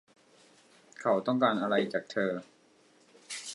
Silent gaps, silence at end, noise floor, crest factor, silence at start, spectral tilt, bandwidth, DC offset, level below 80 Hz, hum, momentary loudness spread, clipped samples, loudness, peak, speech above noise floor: none; 0 s; -63 dBFS; 20 dB; 1 s; -4.5 dB/octave; 11.5 kHz; under 0.1%; -82 dBFS; none; 14 LU; under 0.1%; -30 LUFS; -12 dBFS; 34 dB